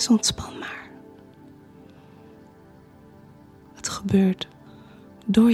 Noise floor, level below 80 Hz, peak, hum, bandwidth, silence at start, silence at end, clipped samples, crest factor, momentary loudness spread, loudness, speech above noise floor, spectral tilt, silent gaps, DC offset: -50 dBFS; -54 dBFS; -6 dBFS; none; 13.5 kHz; 0 s; 0 s; under 0.1%; 20 dB; 27 LU; -24 LUFS; 31 dB; -4.5 dB/octave; none; under 0.1%